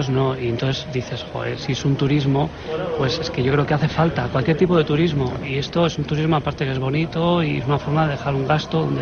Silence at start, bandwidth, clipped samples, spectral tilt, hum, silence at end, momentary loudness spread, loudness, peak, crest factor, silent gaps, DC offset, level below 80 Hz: 0 s; 6.8 kHz; under 0.1%; -7 dB/octave; none; 0 s; 7 LU; -21 LUFS; -4 dBFS; 16 dB; none; under 0.1%; -42 dBFS